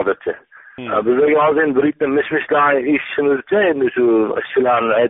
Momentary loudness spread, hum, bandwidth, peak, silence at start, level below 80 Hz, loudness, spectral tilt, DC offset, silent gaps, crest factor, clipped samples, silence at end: 7 LU; none; 3.9 kHz; -4 dBFS; 0 s; -58 dBFS; -16 LUFS; -3.5 dB/octave; under 0.1%; none; 12 dB; under 0.1%; 0 s